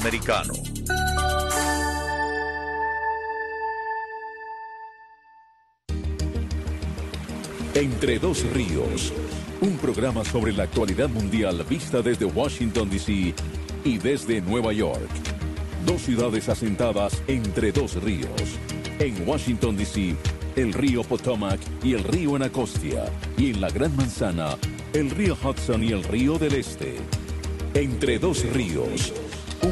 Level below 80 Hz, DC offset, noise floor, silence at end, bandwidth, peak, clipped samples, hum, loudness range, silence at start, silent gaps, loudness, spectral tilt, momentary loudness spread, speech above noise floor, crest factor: -34 dBFS; under 0.1%; -57 dBFS; 0 s; 12.5 kHz; -8 dBFS; under 0.1%; none; 5 LU; 0 s; none; -25 LUFS; -5.5 dB/octave; 8 LU; 33 dB; 16 dB